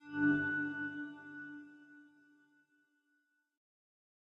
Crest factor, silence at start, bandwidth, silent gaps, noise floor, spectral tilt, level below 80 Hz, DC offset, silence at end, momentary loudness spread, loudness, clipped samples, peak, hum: 20 dB; 0 s; 5.2 kHz; none; -80 dBFS; -7.5 dB/octave; -80 dBFS; under 0.1%; 2.25 s; 22 LU; -37 LUFS; under 0.1%; -22 dBFS; none